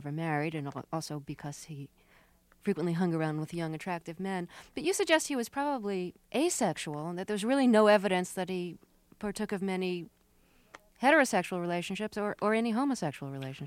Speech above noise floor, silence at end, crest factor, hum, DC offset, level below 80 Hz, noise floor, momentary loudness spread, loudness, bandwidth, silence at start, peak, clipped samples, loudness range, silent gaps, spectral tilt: 34 dB; 0 s; 22 dB; none; under 0.1%; -68 dBFS; -65 dBFS; 15 LU; -31 LUFS; 16.5 kHz; 0 s; -10 dBFS; under 0.1%; 7 LU; none; -5 dB/octave